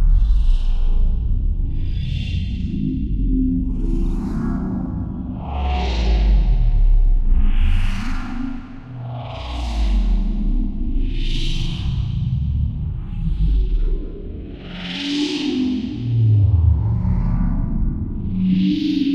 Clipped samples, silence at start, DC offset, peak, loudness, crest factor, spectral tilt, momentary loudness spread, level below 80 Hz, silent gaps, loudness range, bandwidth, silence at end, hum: under 0.1%; 0 s; under 0.1%; -4 dBFS; -22 LUFS; 12 dB; -7.5 dB/octave; 10 LU; -20 dBFS; none; 5 LU; 6.8 kHz; 0 s; none